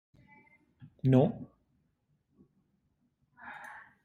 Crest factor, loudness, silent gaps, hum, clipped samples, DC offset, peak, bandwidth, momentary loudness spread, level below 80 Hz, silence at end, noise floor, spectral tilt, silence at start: 24 dB; -28 LUFS; none; none; under 0.1%; under 0.1%; -12 dBFS; 4.2 kHz; 25 LU; -66 dBFS; 0.3 s; -76 dBFS; -10 dB/octave; 1.05 s